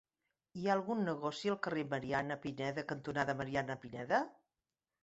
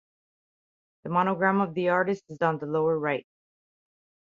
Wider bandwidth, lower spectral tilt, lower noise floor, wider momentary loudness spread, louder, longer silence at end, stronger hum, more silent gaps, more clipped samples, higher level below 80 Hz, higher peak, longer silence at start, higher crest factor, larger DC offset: about the same, 8 kHz vs 7.4 kHz; second, -4.5 dB/octave vs -8 dB/octave; about the same, under -90 dBFS vs under -90 dBFS; about the same, 6 LU vs 6 LU; second, -38 LUFS vs -26 LUFS; second, 0.7 s vs 1.1 s; neither; neither; neither; about the same, -70 dBFS vs -72 dBFS; second, -18 dBFS vs -8 dBFS; second, 0.55 s vs 1.05 s; about the same, 20 dB vs 20 dB; neither